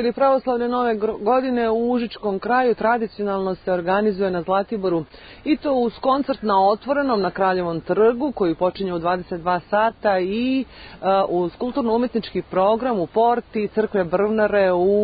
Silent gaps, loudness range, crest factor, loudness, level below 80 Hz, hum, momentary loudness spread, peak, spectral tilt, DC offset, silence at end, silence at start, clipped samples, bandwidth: none; 2 LU; 14 dB; -21 LUFS; -50 dBFS; none; 6 LU; -6 dBFS; -11 dB/octave; under 0.1%; 0 s; 0 s; under 0.1%; 5 kHz